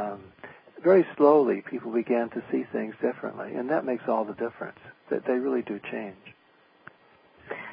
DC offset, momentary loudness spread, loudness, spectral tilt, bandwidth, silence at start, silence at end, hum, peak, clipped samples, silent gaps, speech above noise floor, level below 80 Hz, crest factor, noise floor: under 0.1%; 20 LU; -27 LUFS; -11 dB/octave; 5.2 kHz; 0 s; 0 s; none; -6 dBFS; under 0.1%; none; 35 dB; -74 dBFS; 20 dB; -61 dBFS